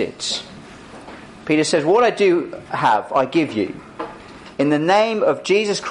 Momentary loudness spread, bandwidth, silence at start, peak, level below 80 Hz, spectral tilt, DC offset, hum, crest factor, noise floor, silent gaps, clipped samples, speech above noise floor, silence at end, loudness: 22 LU; 11 kHz; 0 s; -4 dBFS; -56 dBFS; -4.5 dB/octave; under 0.1%; none; 14 dB; -39 dBFS; none; under 0.1%; 21 dB; 0 s; -18 LUFS